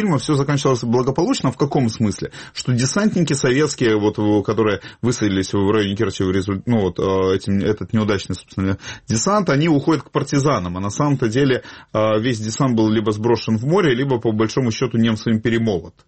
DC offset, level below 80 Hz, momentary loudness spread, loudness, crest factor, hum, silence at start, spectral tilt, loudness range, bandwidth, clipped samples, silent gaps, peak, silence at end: 0.1%; -48 dBFS; 6 LU; -19 LUFS; 12 dB; none; 0 s; -6 dB/octave; 1 LU; 8.8 kHz; under 0.1%; none; -6 dBFS; 0.15 s